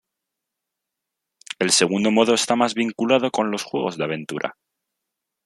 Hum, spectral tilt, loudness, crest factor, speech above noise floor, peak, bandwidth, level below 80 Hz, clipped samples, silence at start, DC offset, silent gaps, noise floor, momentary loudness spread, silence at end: none; -3 dB/octave; -20 LUFS; 20 dB; 62 dB; -2 dBFS; 13 kHz; -68 dBFS; under 0.1%; 1.6 s; under 0.1%; none; -83 dBFS; 11 LU; 0.95 s